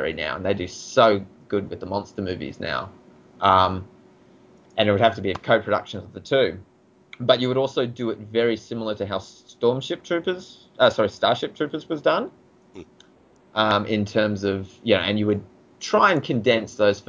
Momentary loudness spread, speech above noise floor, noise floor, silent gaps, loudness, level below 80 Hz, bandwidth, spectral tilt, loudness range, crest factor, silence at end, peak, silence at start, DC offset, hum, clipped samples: 11 LU; 33 dB; -55 dBFS; none; -23 LUFS; -52 dBFS; 7.6 kHz; -5.5 dB/octave; 3 LU; 20 dB; 0.05 s; -4 dBFS; 0 s; under 0.1%; none; under 0.1%